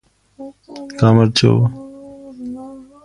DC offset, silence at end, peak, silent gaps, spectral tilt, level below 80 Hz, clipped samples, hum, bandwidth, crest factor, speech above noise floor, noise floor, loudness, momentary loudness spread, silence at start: under 0.1%; 0.25 s; 0 dBFS; none; -6.5 dB/octave; -46 dBFS; under 0.1%; none; 11.5 kHz; 18 dB; 22 dB; -36 dBFS; -14 LUFS; 25 LU; 0.4 s